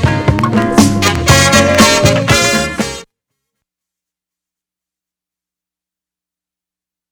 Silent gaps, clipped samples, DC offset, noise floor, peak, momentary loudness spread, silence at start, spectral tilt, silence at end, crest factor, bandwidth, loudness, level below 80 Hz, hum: none; 0.3%; under 0.1%; -87 dBFS; 0 dBFS; 10 LU; 0 s; -4 dB/octave; 4.1 s; 14 dB; over 20 kHz; -10 LUFS; -32 dBFS; none